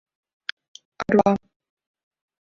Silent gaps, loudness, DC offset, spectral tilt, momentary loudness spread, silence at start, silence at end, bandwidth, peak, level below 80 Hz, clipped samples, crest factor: none; -21 LUFS; under 0.1%; -6.5 dB/octave; 17 LU; 1 s; 1.05 s; 7 kHz; -2 dBFS; -58 dBFS; under 0.1%; 24 dB